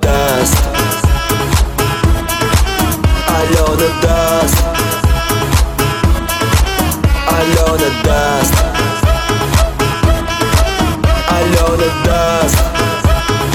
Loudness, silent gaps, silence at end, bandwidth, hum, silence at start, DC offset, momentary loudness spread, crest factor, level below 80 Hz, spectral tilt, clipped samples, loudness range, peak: -13 LUFS; none; 0 s; 18.5 kHz; none; 0 s; under 0.1%; 3 LU; 12 dB; -16 dBFS; -4.5 dB/octave; under 0.1%; 1 LU; 0 dBFS